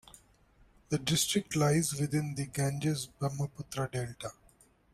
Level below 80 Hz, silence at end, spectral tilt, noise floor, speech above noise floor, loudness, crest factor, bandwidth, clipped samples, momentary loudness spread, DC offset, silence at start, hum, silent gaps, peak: -60 dBFS; 0.6 s; -4.5 dB/octave; -64 dBFS; 32 dB; -32 LUFS; 18 dB; 15.5 kHz; under 0.1%; 10 LU; under 0.1%; 0.9 s; none; none; -16 dBFS